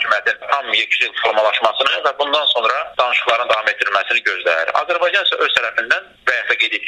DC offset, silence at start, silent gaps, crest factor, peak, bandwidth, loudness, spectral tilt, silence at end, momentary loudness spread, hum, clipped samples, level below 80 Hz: under 0.1%; 0 s; none; 16 dB; 0 dBFS; 12.5 kHz; -16 LUFS; -0.5 dB/octave; 0 s; 3 LU; none; under 0.1%; -62 dBFS